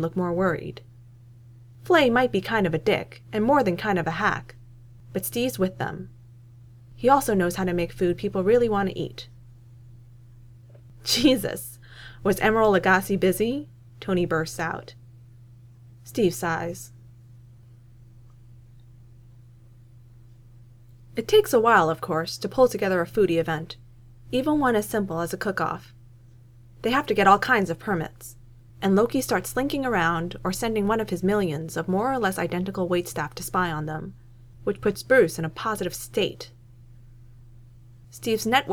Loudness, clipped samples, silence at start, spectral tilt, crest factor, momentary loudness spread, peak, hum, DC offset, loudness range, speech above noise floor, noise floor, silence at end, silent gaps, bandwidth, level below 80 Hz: -24 LUFS; under 0.1%; 0 s; -5 dB/octave; 22 dB; 15 LU; -4 dBFS; none; under 0.1%; 6 LU; 26 dB; -50 dBFS; 0 s; none; 20 kHz; -50 dBFS